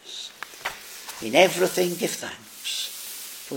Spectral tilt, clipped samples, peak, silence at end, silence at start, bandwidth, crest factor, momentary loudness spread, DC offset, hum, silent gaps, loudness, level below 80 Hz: -3 dB/octave; under 0.1%; -2 dBFS; 0 s; 0.05 s; 17 kHz; 26 dB; 17 LU; under 0.1%; none; none; -25 LUFS; -68 dBFS